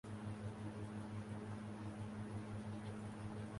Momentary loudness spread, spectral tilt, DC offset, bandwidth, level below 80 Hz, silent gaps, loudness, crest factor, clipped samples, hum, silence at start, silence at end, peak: 1 LU; -7 dB/octave; under 0.1%; 11.5 kHz; -66 dBFS; none; -49 LUFS; 12 dB; under 0.1%; none; 0.05 s; 0 s; -36 dBFS